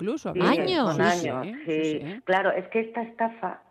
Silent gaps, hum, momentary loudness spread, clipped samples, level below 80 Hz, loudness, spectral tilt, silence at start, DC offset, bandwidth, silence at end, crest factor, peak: none; none; 9 LU; under 0.1%; -66 dBFS; -26 LUFS; -5.5 dB/octave; 0 s; under 0.1%; 13 kHz; 0.15 s; 16 dB; -10 dBFS